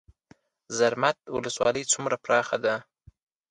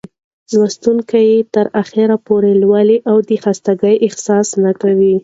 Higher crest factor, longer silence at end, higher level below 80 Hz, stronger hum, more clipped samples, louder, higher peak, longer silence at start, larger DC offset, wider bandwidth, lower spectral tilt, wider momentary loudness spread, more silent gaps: first, 20 dB vs 12 dB; first, 0.7 s vs 0.05 s; second, -64 dBFS vs -58 dBFS; neither; neither; second, -26 LUFS vs -13 LUFS; second, -8 dBFS vs 0 dBFS; first, 0.7 s vs 0.5 s; neither; first, 11 kHz vs 8 kHz; second, -2.5 dB/octave vs -6 dB/octave; first, 8 LU vs 5 LU; neither